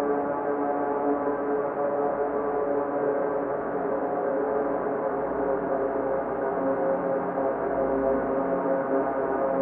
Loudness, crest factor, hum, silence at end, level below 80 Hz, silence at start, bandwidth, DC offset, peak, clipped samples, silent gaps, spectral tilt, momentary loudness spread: -27 LUFS; 14 dB; none; 0 s; -56 dBFS; 0 s; 3.3 kHz; under 0.1%; -12 dBFS; under 0.1%; none; -10.5 dB/octave; 2 LU